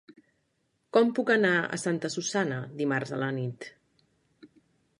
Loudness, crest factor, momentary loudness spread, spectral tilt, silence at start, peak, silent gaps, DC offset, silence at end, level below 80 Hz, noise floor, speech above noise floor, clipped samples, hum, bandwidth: -28 LUFS; 22 dB; 11 LU; -5 dB/octave; 0.95 s; -8 dBFS; none; under 0.1%; 0.55 s; -76 dBFS; -75 dBFS; 47 dB; under 0.1%; none; 11 kHz